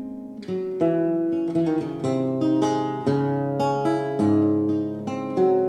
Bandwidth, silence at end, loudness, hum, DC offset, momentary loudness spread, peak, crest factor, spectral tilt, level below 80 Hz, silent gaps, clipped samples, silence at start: 10 kHz; 0 s; -23 LUFS; none; under 0.1%; 8 LU; -8 dBFS; 14 dB; -8 dB/octave; -64 dBFS; none; under 0.1%; 0 s